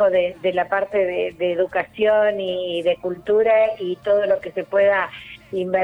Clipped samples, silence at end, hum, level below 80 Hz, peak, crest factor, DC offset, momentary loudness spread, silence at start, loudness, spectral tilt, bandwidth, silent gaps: under 0.1%; 0 s; none; -58 dBFS; -8 dBFS; 12 dB; under 0.1%; 8 LU; 0 s; -20 LUFS; -6.5 dB/octave; 5 kHz; none